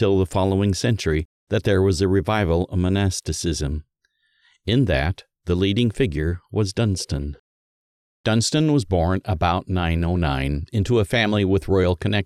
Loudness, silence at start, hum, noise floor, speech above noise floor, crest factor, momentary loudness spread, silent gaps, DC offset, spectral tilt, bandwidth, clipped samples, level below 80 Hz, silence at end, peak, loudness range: -21 LUFS; 0 s; none; -68 dBFS; 48 dB; 16 dB; 7 LU; 1.25-1.47 s, 7.39-8.24 s; under 0.1%; -6 dB/octave; 13 kHz; under 0.1%; -36 dBFS; 0 s; -6 dBFS; 3 LU